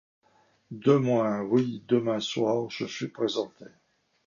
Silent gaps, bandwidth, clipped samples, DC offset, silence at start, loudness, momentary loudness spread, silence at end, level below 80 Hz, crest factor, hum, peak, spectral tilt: none; 7.4 kHz; under 0.1%; under 0.1%; 0.7 s; -27 LUFS; 10 LU; 0.6 s; -72 dBFS; 18 dB; none; -10 dBFS; -6.5 dB/octave